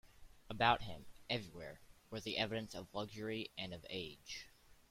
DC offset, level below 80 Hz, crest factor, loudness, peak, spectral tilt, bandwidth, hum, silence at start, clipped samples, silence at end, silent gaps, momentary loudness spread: under 0.1%; -64 dBFS; 26 dB; -42 LUFS; -18 dBFS; -4.5 dB/octave; 16.5 kHz; none; 0.05 s; under 0.1%; 0.15 s; none; 19 LU